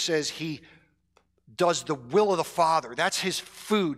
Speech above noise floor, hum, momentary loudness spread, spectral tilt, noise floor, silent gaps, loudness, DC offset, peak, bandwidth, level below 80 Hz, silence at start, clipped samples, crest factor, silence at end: 41 dB; none; 11 LU; -3.5 dB/octave; -68 dBFS; none; -26 LUFS; under 0.1%; -12 dBFS; 15.5 kHz; -68 dBFS; 0 s; under 0.1%; 16 dB; 0 s